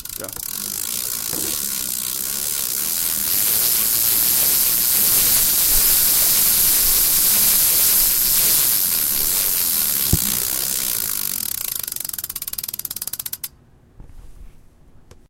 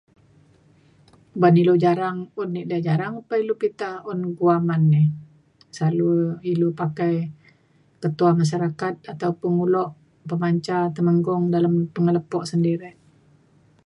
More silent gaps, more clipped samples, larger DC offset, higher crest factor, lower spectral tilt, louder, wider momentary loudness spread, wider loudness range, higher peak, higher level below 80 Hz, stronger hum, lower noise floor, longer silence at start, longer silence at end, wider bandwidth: neither; neither; neither; about the same, 18 dB vs 18 dB; second, 0 dB/octave vs -8.5 dB/octave; first, -16 LUFS vs -22 LUFS; about the same, 13 LU vs 11 LU; first, 11 LU vs 2 LU; about the same, -2 dBFS vs -4 dBFS; first, -40 dBFS vs -66 dBFS; neither; second, -50 dBFS vs -59 dBFS; second, 0 s vs 1.35 s; second, 0.8 s vs 0.95 s; first, 17.5 kHz vs 10.5 kHz